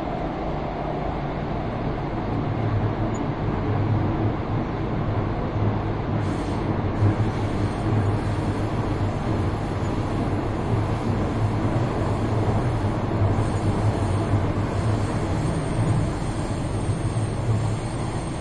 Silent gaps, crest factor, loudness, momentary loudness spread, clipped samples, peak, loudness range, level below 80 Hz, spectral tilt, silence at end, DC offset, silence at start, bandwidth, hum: none; 14 dB; -25 LUFS; 5 LU; under 0.1%; -10 dBFS; 2 LU; -34 dBFS; -7.5 dB/octave; 0 s; under 0.1%; 0 s; 11 kHz; none